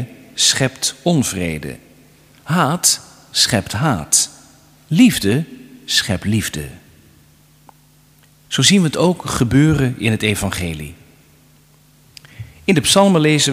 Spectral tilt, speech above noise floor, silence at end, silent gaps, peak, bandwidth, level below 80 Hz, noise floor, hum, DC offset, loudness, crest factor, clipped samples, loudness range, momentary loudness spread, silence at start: -4 dB/octave; 35 dB; 0 s; none; 0 dBFS; 16 kHz; -42 dBFS; -51 dBFS; none; under 0.1%; -16 LUFS; 18 dB; under 0.1%; 4 LU; 17 LU; 0 s